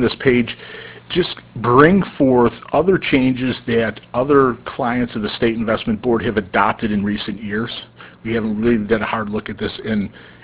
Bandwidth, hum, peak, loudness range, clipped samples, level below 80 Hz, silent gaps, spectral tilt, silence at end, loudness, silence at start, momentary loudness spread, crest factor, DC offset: 4 kHz; none; 0 dBFS; 5 LU; under 0.1%; -42 dBFS; none; -10.5 dB/octave; 0.15 s; -18 LUFS; 0 s; 10 LU; 18 dB; under 0.1%